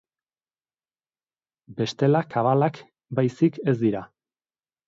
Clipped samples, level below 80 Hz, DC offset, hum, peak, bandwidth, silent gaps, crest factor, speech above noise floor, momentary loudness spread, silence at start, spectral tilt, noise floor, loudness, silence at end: under 0.1%; -66 dBFS; under 0.1%; none; -8 dBFS; 7.6 kHz; none; 18 dB; over 67 dB; 9 LU; 1.7 s; -8 dB/octave; under -90 dBFS; -24 LUFS; 0.85 s